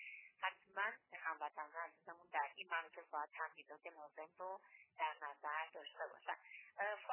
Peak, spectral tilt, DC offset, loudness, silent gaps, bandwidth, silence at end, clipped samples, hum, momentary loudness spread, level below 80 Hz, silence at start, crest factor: -28 dBFS; 3 dB/octave; under 0.1%; -48 LUFS; none; 3.2 kHz; 0 s; under 0.1%; none; 12 LU; under -90 dBFS; 0 s; 20 dB